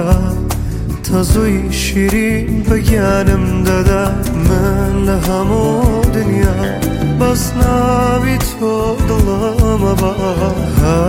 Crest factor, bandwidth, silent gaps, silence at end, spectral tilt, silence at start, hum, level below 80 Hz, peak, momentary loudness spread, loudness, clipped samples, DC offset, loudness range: 12 dB; 17 kHz; none; 0 s; -6.5 dB/octave; 0 s; none; -20 dBFS; 0 dBFS; 4 LU; -14 LUFS; under 0.1%; under 0.1%; 1 LU